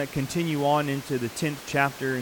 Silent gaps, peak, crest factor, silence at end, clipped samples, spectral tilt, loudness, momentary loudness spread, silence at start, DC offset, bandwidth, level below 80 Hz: none; -8 dBFS; 20 dB; 0 s; under 0.1%; -5 dB/octave; -26 LUFS; 6 LU; 0 s; under 0.1%; 19 kHz; -56 dBFS